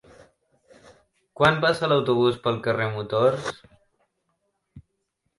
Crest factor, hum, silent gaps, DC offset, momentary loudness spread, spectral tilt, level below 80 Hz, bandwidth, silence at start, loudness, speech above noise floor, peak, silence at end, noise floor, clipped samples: 20 dB; none; none; under 0.1%; 10 LU; -6 dB/octave; -58 dBFS; 11.5 kHz; 1.4 s; -23 LUFS; 54 dB; -6 dBFS; 0.6 s; -76 dBFS; under 0.1%